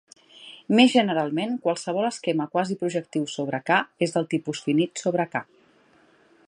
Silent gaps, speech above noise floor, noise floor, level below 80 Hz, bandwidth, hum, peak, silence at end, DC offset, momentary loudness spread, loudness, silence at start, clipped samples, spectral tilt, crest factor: none; 35 dB; -59 dBFS; -74 dBFS; 10.5 kHz; none; -2 dBFS; 1.05 s; under 0.1%; 11 LU; -24 LUFS; 0.4 s; under 0.1%; -5 dB/octave; 22 dB